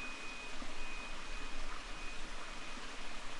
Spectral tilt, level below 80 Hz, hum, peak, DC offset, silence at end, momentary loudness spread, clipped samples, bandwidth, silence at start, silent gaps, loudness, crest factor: -2.5 dB/octave; -46 dBFS; none; -28 dBFS; under 0.1%; 0 s; 1 LU; under 0.1%; 11 kHz; 0 s; none; -46 LUFS; 12 dB